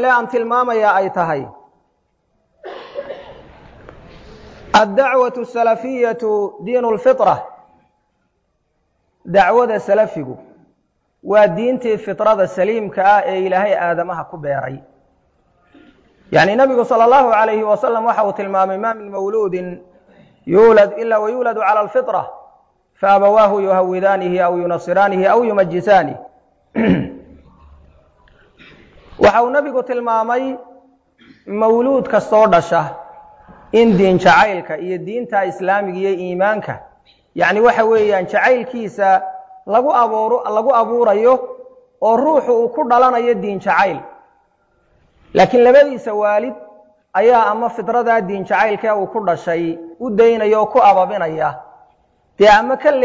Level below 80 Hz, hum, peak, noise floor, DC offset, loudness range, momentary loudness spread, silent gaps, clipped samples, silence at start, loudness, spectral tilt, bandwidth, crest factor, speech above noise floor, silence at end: -52 dBFS; none; -2 dBFS; -66 dBFS; under 0.1%; 5 LU; 13 LU; none; under 0.1%; 0 s; -15 LUFS; -6 dB/octave; 7.8 kHz; 14 dB; 52 dB; 0 s